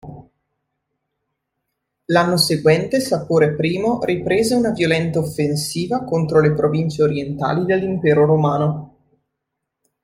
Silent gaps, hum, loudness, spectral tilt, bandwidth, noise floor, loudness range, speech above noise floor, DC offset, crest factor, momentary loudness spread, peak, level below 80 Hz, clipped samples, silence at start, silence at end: none; none; -18 LUFS; -5.5 dB/octave; 15.5 kHz; -79 dBFS; 2 LU; 61 dB; under 0.1%; 18 dB; 6 LU; -2 dBFS; -52 dBFS; under 0.1%; 0.05 s; 1.15 s